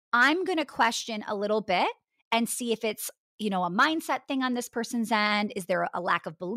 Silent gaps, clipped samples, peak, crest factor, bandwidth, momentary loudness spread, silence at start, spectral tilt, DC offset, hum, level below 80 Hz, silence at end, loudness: 2.25-2.31 s, 3.18-3.39 s; under 0.1%; -12 dBFS; 16 dB; 16 kHz; 8 LU; 0.15 s; -3.5 dB/octave; under 0.1%; none; -76 dBFS; 0 s; -27 LUFS